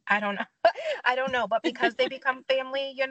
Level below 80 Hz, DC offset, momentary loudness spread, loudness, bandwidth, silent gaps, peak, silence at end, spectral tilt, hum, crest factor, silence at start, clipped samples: -72 dBFS; under 0.1%; 4 LU; -27 LUFS; 8.4 kHz; none; -8 dBFS; 0 s; -4 dB/octave; none; 20 dB; 0.05 s; under 0.1%